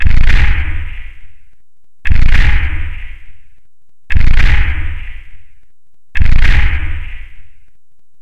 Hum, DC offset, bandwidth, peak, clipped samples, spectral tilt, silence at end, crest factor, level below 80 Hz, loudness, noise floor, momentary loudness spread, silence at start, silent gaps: none; under 0.1%; 5.2 kHz; 0 dBFS; under 0.1%; -6 dB/octave; 0.65 s; 8 dB; -12 dBFS; -16 LUFS; -59 dBFS; 20 LU; 0 s; none